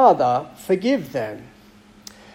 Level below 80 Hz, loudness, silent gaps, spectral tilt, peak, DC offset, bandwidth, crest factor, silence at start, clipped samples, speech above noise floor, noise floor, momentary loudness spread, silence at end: -60 dBFS; -21 LUFS; none; -6 dB/octave; -2 dBFS; under 0.1%; 16.5 kHz; 18 dB; 0 s; under 0.1%; 29 dB; -49 dBFS; 24 LU; 0.9 s